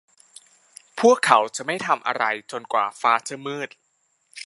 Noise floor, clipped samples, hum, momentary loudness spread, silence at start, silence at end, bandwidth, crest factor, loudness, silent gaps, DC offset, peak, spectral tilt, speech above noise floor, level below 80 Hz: -69 dBFS; under 0.1%; none; 14 LU; 0.95 s; 0.05 s; 11.5 kHz; 24 dB; -22 LUFS; none; under 0.1%; 0 dBFS; -3 dB/octave; 47 dB; -78 dBFS